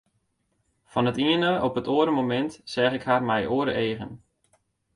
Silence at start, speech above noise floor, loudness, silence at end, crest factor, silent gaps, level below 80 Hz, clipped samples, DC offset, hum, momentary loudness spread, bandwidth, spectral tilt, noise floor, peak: 0.95 s; 49 dB; -25 LUFS; 0.8 s; 18 dB; none; -58 dBFS; under 0.1%; under 0.1%; none; 7 LU; 11.5 kHz; -6.5 dB/octave; -73 dBFS; -8 dBFS